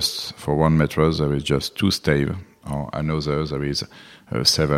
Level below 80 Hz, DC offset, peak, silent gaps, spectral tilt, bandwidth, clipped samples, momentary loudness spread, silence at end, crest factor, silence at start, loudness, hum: -40 dBFS; under 0.1%; -2 dBFS; none; -5 dB/octave; 15.5 kHz; under 0.1%; 11 LU; 0 s; 20 dB; 0 s; -22 LUFS; none